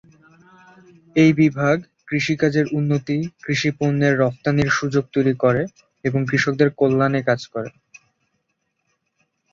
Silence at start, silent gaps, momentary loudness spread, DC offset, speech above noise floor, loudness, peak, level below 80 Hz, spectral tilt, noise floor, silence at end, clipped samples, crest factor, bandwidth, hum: 1.15 s; none; 8 LU; under 0.1%; 54 dB; -20 LUFS; -2 dBFS; -56 dBFS; -6.5 dB/octave; -73 dBFS; 1.85 s; under 0.1%; 18 dB; 7.4 kHz; none